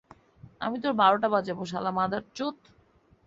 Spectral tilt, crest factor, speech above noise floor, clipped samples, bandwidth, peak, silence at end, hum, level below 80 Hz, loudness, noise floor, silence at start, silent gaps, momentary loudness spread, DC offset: -5.5 dB/octave; 20 dB; 35 dB; under 0.1%; 7.8 kHz; -8 dBFS; 0.75 s; none; -66 dBFS; -27 LUFS; -62 dBFS; 0.45 s; none; 12 LU; under 0.1%